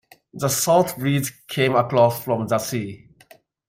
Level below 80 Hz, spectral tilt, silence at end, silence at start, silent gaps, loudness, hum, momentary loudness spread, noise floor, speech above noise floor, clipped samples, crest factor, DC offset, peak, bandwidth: -60 dBFS; -4.5 dB/octave; 0.75 s; 0.35 s; none; -21 LUFS; none; 10 LU; -53 dBFS; 32 dB; under 0.1%; 18 dB; under 0.1%; -4 dBFS; 16 kHz